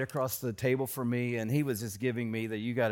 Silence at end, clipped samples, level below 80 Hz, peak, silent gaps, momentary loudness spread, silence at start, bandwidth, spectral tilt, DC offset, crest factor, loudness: 0 s; under 0.1%; -68 dBFS; -16 dBFS; none; 3 LU; 0 s; 17 kHz; -6 dB/octave; under 0.1%; 14 dB; -32 LUFS